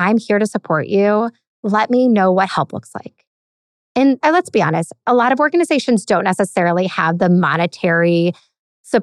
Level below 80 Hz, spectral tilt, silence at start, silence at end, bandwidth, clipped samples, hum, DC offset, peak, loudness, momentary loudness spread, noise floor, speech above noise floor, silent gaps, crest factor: -64 dBFS; -6 dB/octave; 0 s; 0 s; 12 kHz; under 0.1%; none; under 0.1%; -2 dBFS; -16 LUFS; 8 LU; under -90 dBFS; over 75 dB; 1.47-1.63 s, 3.27-3.95 s, 8.59-8.84 s; 14 dB